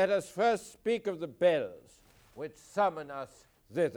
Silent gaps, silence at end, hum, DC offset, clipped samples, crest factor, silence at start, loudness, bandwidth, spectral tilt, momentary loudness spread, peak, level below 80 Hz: none; 0 s; none; under 0.1%; under 0.1%; 18 dB; 0 s; -32 LUFS; 19 kHz; -5 dB/octave; 16 LU; -16 dBFS; -70 dBFS